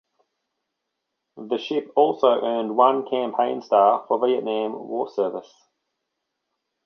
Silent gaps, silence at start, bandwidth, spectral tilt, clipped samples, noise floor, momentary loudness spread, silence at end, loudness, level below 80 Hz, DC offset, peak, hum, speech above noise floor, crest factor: none; 1.35 s; 6.6 kHz; -6 dB/octave; under 0.1%; -80 dBFS; 10 LU; 1.45 s; -22 LUFS; -78 dBFS; under 0.1%; -4 dBFS; none; 59 dB; 20 dB